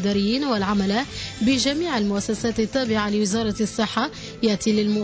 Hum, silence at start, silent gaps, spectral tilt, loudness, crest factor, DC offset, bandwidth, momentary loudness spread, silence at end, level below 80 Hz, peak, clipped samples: none; 0 s; none; -4.5 dB/octave; -22 LUFS; 12 dB; under 0.1%; 8 kHz; 4 LU; 0 s; -46 dBFS; -10 dBFS; under 0.1%